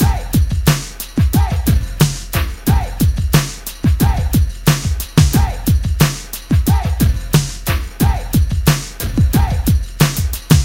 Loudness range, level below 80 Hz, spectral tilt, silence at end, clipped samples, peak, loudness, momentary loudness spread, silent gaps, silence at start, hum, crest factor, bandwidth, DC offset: 1 LU; -20 dBFS; -5.5 dB/octave; 0 s; under 0.1%; 0 dBFS; -16 LUFS; 5 LU; none; 0 s; none; 14 dB; 17.5 kHz; 0.3%